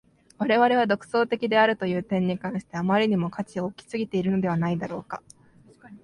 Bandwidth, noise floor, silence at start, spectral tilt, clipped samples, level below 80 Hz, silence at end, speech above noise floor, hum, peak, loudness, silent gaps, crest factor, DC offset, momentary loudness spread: 11 kHz; -54 dBFS; 0.4 s; -7 dB/octave; under 0.1%; -62 dBFS; 0.05 s; 30 dB; none; -8 dBFS; -25 LUFS; none; 18 dB; under 0.1%; 11 LU